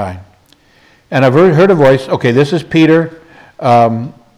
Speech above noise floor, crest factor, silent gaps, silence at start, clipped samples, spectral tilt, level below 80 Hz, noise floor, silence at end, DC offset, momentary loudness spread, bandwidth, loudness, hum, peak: 39 dB; 12 dB; none; 0 s; under 0.1%; -7.5 dB/octave; -50 dBFS; -48 dBFS; 0.25 s; under 0.1%; 11 LU; 12.5 kHz; -10 LUFS; none; 0 dBFS